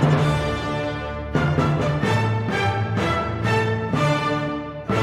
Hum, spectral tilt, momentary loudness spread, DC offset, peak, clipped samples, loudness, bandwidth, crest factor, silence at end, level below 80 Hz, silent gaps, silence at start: none; -6.5 dB/octave; 5 LU; under 0.1%; -6 dBFS; under 0.1%; -22 LUFS; 12 kHz; 16 dB; 0 s; -38 dBFS; none; 0 s